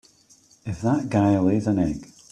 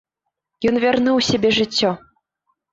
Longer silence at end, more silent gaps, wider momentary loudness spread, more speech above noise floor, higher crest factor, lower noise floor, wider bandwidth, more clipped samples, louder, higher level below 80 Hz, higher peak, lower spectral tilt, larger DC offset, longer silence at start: second, 0.25 s vs 0.75 s; neither; first, 15 LU vs 6 LU; second, 35 dB vs 62 dB; about the same, 16 dB vs 14 dB; second, -56 dBFS vs -79 dBFS; first, 10 kHz vs 8 kHz; neither; second, -22 LUFS vs -18 LUFS; about the same, -50 dBFS vs -52 dBFS; about the same, -6 dBFS vs -6 dBFS; first, -8 dB/octave vs -4.5 dB/octave; neither; about the same, 0.65 s vs 0.6 s